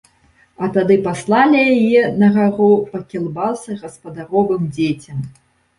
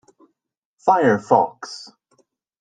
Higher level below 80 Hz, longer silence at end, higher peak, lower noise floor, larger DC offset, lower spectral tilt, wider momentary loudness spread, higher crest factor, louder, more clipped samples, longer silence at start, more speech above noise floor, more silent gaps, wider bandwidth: first, -54 dBFS vs -66 dBFS; second, 0.5 s vs 0.75 s; about the same, -2 dBFS vs -2 dBFS; second, -54 dBFS vs -76 dBFS; neither; about the same, -7 dB/octave vs -6 dB/octave; about the same, 16 LU vs 18 LU; second, 14 dB vs 20 dB; about the same, -16 LUFS vs -18 LUFS; neither; second, 0.6 s vs 0.85 s; second, 39 dB vs 58 dB; neither; first, 11 kHz vs 9.4 kHz